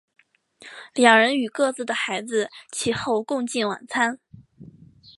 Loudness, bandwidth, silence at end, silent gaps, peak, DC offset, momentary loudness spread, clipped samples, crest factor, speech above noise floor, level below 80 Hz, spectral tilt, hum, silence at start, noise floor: -22 LUFS; 11.5 kHz; 0.5 s; none; 0 dBFS; under 0.1%; 15 LU; under 0.1%; 24 dB; 30 dB; -64 dBFS; -3 dB/octave; none; 0.6 s; -52 dBFS